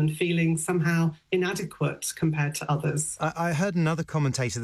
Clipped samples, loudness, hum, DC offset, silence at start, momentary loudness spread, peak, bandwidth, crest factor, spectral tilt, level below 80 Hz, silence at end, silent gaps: under 0.1%; -27 LUFS; none; under 0.1%; 0 s; 4 LU; -14 dBFS; 13.5 kHz; 12 dB; -5.5 dB/octave; -60 dBFS; 0 s; none